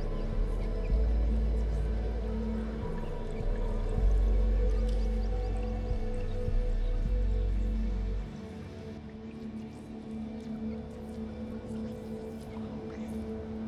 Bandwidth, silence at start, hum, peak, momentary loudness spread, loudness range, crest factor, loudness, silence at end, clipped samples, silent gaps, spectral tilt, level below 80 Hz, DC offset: 6.2 kHz; 0 s; none; -16 dBFS; 11 LU; 8 LU; 14 dB; -35 LUFS; 0 s; under 0.1%; none; -8.5 dB/octave; -32 dBFS; under 0.1%